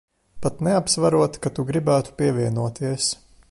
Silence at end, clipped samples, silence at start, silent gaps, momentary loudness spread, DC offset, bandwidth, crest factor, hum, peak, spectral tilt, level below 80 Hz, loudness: 0.35 s; under 0.1%; 0.35 s; none; 8 LU; under 0.1%; 11.5 kHz; 16 dB; none; -6 dBFS; -5 dB/octave; -52 dBFS; -22 LUFS